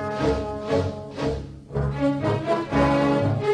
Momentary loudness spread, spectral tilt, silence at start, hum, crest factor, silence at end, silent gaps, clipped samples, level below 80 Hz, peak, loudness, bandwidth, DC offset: 9 LU; -7.5 dB/octave; 0 s; none; 12 dB; 0 s; none; under 0.1%; -38 dBFS; -12 dBFS; -24 LUFS; 11 kHz; under 0.1%